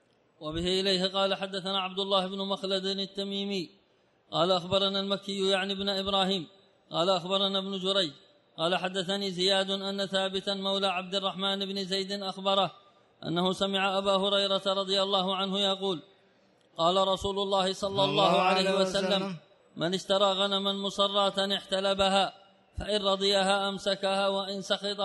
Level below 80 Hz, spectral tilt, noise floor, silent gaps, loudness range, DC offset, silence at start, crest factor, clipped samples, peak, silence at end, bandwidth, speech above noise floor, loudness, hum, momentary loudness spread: -60 dBFS; -4 dB/octave; -67 dBFS; none; 3 LU; under 0.1%; 0.4 s; 20 dB; under 0.1%; -10 dBFS; 0 s; 11.5 kHz; 38 dB; -28 LUFS; none; 8 LU